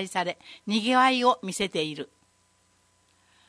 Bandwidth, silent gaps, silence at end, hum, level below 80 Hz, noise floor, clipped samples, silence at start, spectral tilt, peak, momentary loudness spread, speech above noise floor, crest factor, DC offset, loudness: 11 kHz; none; 1.4 s; 60 Hz at -60 dBFS; -68 dBFS; -66 dBFS; under 0.1%; 0 s; -3.5 dB/octave; -8 dBFS; 18 LU; 40 dB; 20 dB; under 0.1%; -25 LUFS